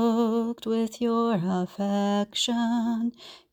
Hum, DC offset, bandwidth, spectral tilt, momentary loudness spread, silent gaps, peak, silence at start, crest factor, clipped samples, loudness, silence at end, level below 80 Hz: none; under 0.1%; 15.5 kHz; -5.5 dB/octave; 4 LU; none; -14 dBFS; 0 s; 12 dB; under 0.1%; -26 LUFS; 0.15 s; -66 dBFS